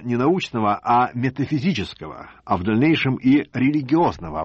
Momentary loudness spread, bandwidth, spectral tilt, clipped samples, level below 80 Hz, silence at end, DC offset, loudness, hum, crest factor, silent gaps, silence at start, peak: 9 LU; 8 kHz; -7.5 dB/octave; under 0.1%; -50 dBFS; 0 s; under 0.1%; -20 LUFS; none; 14 dB; none; 0 s; -8 dBFS